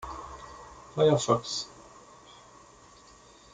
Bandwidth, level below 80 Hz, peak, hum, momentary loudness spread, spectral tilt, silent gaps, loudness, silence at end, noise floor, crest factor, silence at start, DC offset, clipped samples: 9.6 kHz; -58 dBFS; -10 dBFS; none; 27 LU; -5 dB/octave; none; -27 LUFS; 1.7 s; -55 dBFS; 22 dB; 0 s; under 0.1%; under 0.1%